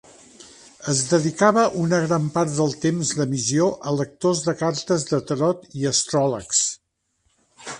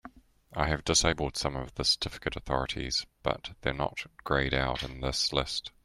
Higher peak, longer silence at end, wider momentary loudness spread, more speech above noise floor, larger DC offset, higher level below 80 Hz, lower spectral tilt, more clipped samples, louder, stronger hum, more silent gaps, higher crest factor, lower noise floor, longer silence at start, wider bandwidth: first, -4 dBFS vs -10 dBFS; second, 0 s vs 0.15 s; about the same, 7 LU vs 9 LU; first, 49 dB vs 22 dB; neither; second, -60 dBFS vs -44 dBFS; first, -4.5 dB/octave vs -3 dB/octave; neither; first, -21 LUFS vs -30 LUFS; neither; neither; about the same, 20 dB vs 22 dB; first, -70 dBFS vs -53 dBFS; first, 0.4 s vs 0.05 s; second, 11.5 kHz vs 15 kHz